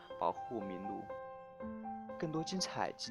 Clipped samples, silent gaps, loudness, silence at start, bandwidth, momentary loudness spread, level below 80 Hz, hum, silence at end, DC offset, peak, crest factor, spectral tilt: under 0.1%; none; -42 LUFS; 0 s; 12.5 kHz; 10 LU; -72 dBFS; none; 0 s; under 0.1%; -20 dBFS; 22 dB; -4 dB/octave